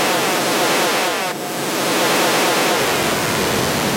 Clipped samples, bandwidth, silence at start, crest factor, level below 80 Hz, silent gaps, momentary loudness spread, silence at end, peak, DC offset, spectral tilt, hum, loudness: under 0.1%; 16 kHz; 0 s; 12 dB; -48 dBFS; none; 5 LU; 0 s; -6 dBFS; under 0.1%; -2.5 dB/octave; none; -17 LUFS